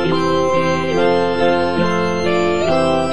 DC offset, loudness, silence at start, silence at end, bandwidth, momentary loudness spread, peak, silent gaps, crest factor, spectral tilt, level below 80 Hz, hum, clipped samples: 4%; -16 LUFS; 0 s; 0 s; 10 kHz; 2 LU; -4 dBFS; none; 12 dB; -6 dB/octave; -44 dBFS; none; under 0.1%